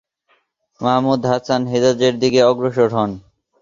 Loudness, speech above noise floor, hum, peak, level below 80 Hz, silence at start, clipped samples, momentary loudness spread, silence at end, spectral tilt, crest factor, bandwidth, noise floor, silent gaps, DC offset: -17 LUFS; 47 dB; none; 0 dBFS; -54 dBFS; 0.8 s; under 0.1%; 8 LU; 0.45 s; -5.5 dB/octave; 16 dB; 7.4 kHz; -63 dBFS; none; under 0.1%